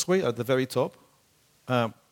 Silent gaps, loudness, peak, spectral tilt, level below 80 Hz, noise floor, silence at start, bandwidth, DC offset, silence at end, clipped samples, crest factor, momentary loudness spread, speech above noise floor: none; -27 LUFS; -8 dBFS; -5.5 dB/octave; -68 dBFS; -64 dBFS; 0 s; 17.5 kHz; under 0.1%; 0.2 s; under 0.1%; 20 dB; 6 LU; 38 dB